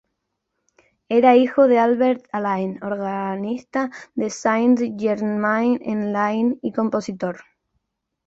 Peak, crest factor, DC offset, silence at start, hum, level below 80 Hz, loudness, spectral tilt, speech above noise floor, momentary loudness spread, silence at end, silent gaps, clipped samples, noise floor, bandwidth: -4 dBFS; 18 dB; under 0.1%; 1.1 s; none; -66 dBFS; -20 LUFS; -6 dB/octave; 57 dB; 12 LU; 0.85 s; none; under 0.1%; -77 dBFS; 7.8 kHz